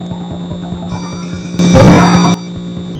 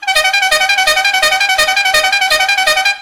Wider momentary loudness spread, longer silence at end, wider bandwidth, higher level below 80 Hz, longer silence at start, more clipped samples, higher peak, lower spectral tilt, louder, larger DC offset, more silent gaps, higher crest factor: first, 17 LU vs 1 LU; about the same, 0 s vs 0 s; second, 9 kHz vs over 20 kHz; first, -30 dBFS vs -42 dBFS; about the same, 0 s vs 0 s; second, under 0.1% vs 0.5%; about the same, 0 dBFS vs 0 dBFS; first, -6 dB/octave vs 2 dB/octave; about the same, -9 LUFS vs -10 LUFS; second, under 0.1% vs 0.2%; neither; about the same, 10 dB vs 12 dB